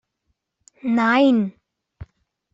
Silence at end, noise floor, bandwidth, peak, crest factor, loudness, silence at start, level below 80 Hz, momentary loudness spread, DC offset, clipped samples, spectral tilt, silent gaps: 0.5 s; -74 dBFS; 7.8 kHz; -6 dBFS; 16 dB; -19 LUFS; 0.85 s; -56 dBFS; 14 LU; under 0.1%; under 0.1%; -6.5 dB/octave; none